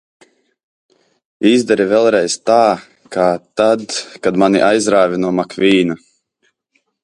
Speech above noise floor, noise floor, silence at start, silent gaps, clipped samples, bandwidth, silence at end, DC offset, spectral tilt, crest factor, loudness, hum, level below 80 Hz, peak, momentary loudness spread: 51 dB; -65 dBFS; 1.4 s; none; under 0.1%; 11.5 kHz; 1.1 s; under 0.1%; -4.5 dB/octave; 16 dB; -14 LUFS; none; -58 dBFS; 0 dBFS; 7 LU